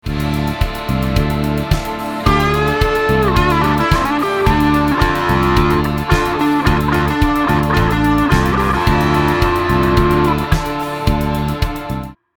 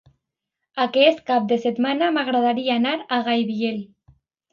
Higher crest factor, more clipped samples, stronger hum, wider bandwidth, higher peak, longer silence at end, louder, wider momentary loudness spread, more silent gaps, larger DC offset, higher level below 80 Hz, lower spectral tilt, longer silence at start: second, 14 dB vs 20 dB; neither; neither; first, over 20 kHz vs 7 kHz; about the same, 0 dBFS vs -2 dBFS; second, 0.25 s vs 0.65 s; first, -15 LUFS vs -21 LUFS; about the same, 6 LU vs 8 LU; neither; first, 0.2% vs under 0.1%; first, -22 dBFS vs -68 dBFS; about the same, -6.5 dB/octave vs -6 dB/octave; second, 0.05 s vs 0.75 s